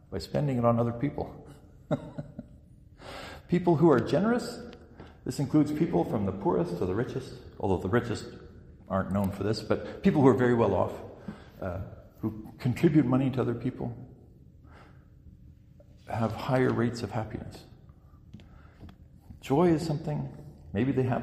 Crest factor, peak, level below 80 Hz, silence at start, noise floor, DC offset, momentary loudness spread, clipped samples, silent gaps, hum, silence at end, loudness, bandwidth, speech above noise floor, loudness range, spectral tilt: 22 dB; -8 dBFS; -54 dBFS; 0.1 s; -54 dBFS; under 0.1%; 21 LU; under 0.1%; none; none; 0 s; -28 LUFS; 15 kHz; 27 dB; 6 LU; -8 dB/octave